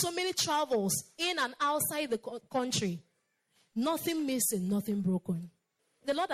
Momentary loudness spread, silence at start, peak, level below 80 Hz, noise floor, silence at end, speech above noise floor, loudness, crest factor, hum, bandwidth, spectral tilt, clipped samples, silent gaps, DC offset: 8 LU; 0 s; -16 dBFS; -70 dBFS; -76 dBFS; 0 s; 44 dB; -32 LUFS; 16 dB; none; 16 kHz; -3.5 dB/octave; under 0.1%; none; under 0.1%